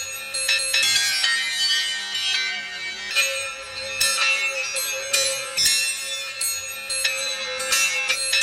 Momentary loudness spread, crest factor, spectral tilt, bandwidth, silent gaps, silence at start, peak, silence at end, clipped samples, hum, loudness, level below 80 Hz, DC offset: 9 LU; 18 dB; 2.5 dB/octave; 17 kHz; none; 0 s; -4 dBFS; 0 s; under 0.1%; none; -21 LUFS; -62 dBFS; under 0.1%